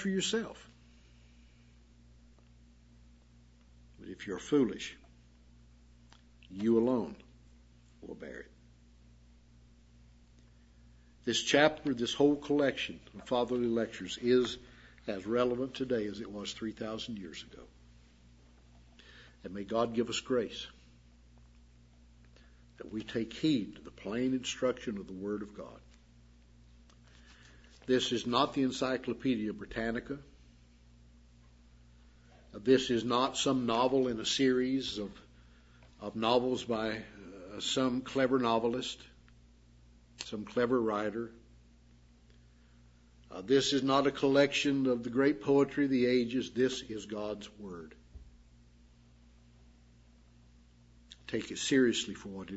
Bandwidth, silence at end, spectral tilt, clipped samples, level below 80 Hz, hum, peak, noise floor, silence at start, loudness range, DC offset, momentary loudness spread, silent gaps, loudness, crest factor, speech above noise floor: 7.6 kHz; 0 s; -3.5 dB/octave; under 0.1%; -62 dBFS; 60 Hz at -65 dBFS; -8 dBFS; -61 dBFS; 0 s; 12 LU; under 0.1%; 18 LU; none; -32 LUFS; 26 dB; 29 dB